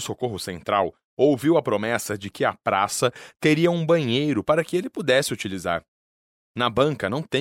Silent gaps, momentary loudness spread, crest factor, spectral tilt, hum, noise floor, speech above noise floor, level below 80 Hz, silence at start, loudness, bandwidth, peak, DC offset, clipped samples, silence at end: 1.04-1.17 s, 5.88-6.54 s; 9 LU; 16 dB; -5 dB/octave; none; under -90 dBFS; over 67 dB; -58 dBFS; 0 s; -23 LUFS; 16.5 kHz; -6 dBFS; under 0.1%; under 0.1%; 0 s